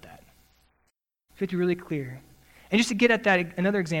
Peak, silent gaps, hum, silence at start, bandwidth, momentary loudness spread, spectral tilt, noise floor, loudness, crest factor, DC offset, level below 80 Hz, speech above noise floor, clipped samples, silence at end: -8 dBFS; none; none; 0.05 s; 16.5 kHz; 13 LU; -5 dB/octave; -74 dBFS; -25 LUFS; 20 dB; under 0.1%; -60 dBFS; 49 dB; under 0.1%; 0 s